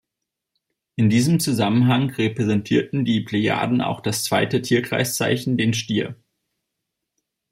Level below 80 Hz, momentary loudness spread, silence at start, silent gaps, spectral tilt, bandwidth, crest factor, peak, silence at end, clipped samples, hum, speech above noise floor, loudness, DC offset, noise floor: -60 dBFS; 5 LU; 1 s; none; -5.5 dB/octave; 16 kHz; 16 dB; -6 dBFS; 1.4 s; under 0.1%; none; 63 dB; -20 LUFS; under 0.1%; -83 dBFS